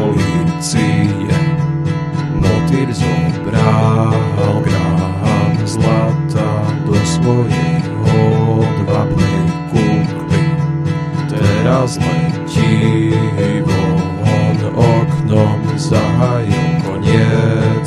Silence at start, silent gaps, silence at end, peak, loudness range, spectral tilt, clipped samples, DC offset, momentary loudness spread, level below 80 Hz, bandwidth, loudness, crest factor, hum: 0 s; none; 0 s; 0 dBFS; 1 LU; -7 dB/octave; under 0.1%; under 0.1%; 4 LU; -34 dBFS; 12 kHz; -14 LUFS; 12 dB; none